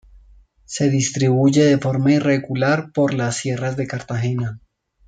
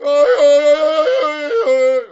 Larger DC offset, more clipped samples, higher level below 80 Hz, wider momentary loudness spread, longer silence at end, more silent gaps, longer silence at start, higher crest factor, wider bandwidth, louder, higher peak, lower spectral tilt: neither; neither; first, -54 dBFS vs -62 dBFS; first, 10 LU vs 7 LU; first, 0.5 s vs 0.05 s; neither; first, 0.7 s vs 0 s; first, 16 dB vs 10 dB; first, 9.4 kHz vs 8 kHz; second, -19 LUFS vs -13 LUFS; about the same, -4 dBFS vs -2 dBFS; first, -6 dB/octave vs -1 dB/octave